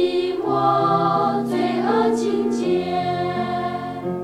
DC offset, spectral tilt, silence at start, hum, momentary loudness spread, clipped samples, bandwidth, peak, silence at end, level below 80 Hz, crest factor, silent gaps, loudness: under 0.1%; -6.5 dB/octave; 0 s; none; 6 LU; under 0.1%; 12.5 kHz; -6 dBFS; 0 s; -56 dBFS; 14 dB; none; -21 LUFS